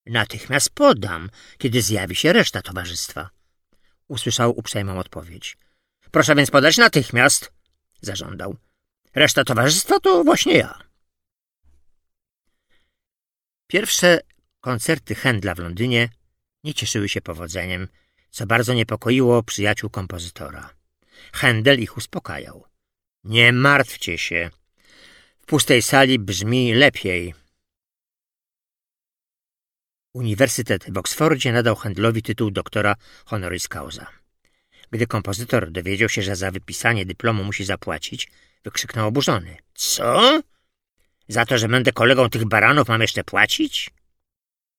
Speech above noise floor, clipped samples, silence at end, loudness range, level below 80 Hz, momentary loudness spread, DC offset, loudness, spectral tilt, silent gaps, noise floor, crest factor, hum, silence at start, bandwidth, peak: over 71 dB; under 0.1%; 0.9 s; 8 LU; -52 dBFS; 17 LU; under 0.1%; -19 LUFS; -4 dB/octave; none; under -90 dBFS; 20 dB; none; 0.05 s; 17.5 kHz; 0 dBFS